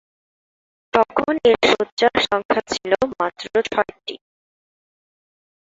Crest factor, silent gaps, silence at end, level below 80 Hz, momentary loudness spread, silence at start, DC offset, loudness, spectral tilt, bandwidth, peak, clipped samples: 20 dB; 1.92-1.97 s, 2.45-2.49 s; 1.6 s; -54 dBFS; 8 LU; 0.95 s; under 0.1%; -19 LUFS; -3.5 dB/octave; 7.8 kHz; -2 dBFS; under 0.1%